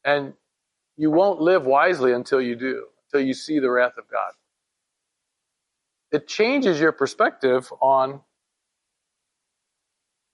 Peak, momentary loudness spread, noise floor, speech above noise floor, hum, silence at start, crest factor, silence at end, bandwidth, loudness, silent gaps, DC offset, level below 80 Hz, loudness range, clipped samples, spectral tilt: -6 dBFS; 10 LU; -80 dBFS; 60 dB; none; 0.05 s; 18 dB; 2.15 s; 11.5 kHz; -21 LUFS; none; under 0.1%; -76 dBFS; 5 LU; under 0.1%; -5 dB/octave